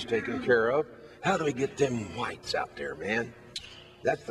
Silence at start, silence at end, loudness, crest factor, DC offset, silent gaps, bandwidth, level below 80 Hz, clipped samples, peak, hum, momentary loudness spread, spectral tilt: 0 s; 0 s; -30 LUFS; 18 dB; under 0.1%; none; 12 kHz; -60 dBFS; under 0.1%; -12 dBFS; none; 15 LU; -5 dB/octave